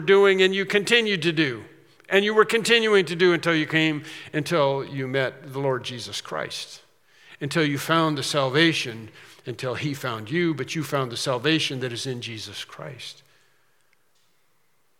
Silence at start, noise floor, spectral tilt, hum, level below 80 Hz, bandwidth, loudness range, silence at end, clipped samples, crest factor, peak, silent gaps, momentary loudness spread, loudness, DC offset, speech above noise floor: 0 s; -69 dBFS; -4.5 dB/octave; none; -76 dBFS; 16.5 kHz; 8 LU; 1.85 s; under 0.1%; 22 dB; -2 dBFS; none; 16 LU; -23 LUFS; under 0.1%; 46 dB